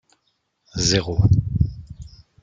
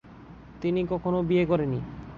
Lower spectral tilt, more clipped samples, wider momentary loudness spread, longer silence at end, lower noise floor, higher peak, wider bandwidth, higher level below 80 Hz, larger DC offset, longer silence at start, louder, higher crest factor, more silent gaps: second, -5 dB/octave vs -9.5 dB/octave; neither; first, 21 LU vs 16 LU; first, 0.35 s vs 0 s; first, -70 dBFS vs -47 dBFS; first, -4 dBFS vs -12 dBFS; first, 9.2 kHz vs 6.6 kHz; first, -34 dBFS vs -50 dBFS; neither; first, 0.75 s vs 0.05 s; first, -20 LUFS vs -27 LUFS; about the same, 20 dB vs 16 dB; neither